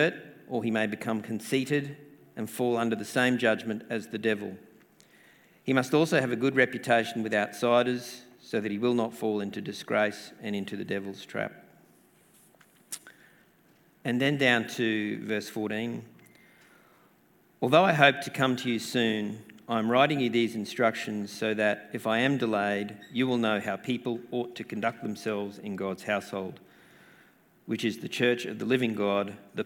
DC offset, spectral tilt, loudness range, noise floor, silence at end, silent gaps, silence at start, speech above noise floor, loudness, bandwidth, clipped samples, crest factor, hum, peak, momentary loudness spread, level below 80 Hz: under 0.1%; -5 dB/octave; 8 LU; -63 dBFS; 0 s; none; 0 s; 35 dB; -28 LUFS; 18 kHz; under 0.1%; 26 dB; none; -2 dBFS; 13 LU; -76 dBFS